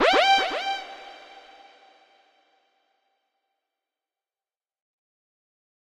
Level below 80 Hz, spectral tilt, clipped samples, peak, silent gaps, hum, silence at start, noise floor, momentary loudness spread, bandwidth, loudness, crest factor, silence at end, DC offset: -64 dBFS; -0.5 dB/octave; under 0.1%; -8 dBFS; none; none; 0 s; under -90 dBFS; 26 LU; 13.5 kHz; -22 LUFS; 20 dB; 4.85 s; under 0.1%